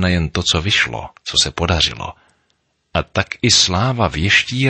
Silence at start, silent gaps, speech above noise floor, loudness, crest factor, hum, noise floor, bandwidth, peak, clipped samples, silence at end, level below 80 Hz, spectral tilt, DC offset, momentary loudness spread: 0 s; none; 49 dB; -16 LUFS; 16 dB; none; -66 dBFS; 8.8 kHz; -2 dBFS; under 0.1%; 0 s; -34 dBFS; -3 dB/octave; under 0.1%; 11 LU